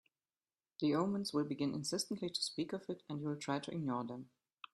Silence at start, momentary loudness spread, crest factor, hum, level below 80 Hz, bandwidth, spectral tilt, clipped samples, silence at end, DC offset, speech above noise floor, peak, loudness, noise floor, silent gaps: 0.8 s; 9 LU; 18 dB; none; -80 dBFS; 13 kHz; -5 dB/octave; under 0.1%; 0.5 s; under 0.1%; over 51 dB; -22 dBFS; -39 LUFS; under -90 dBFS; none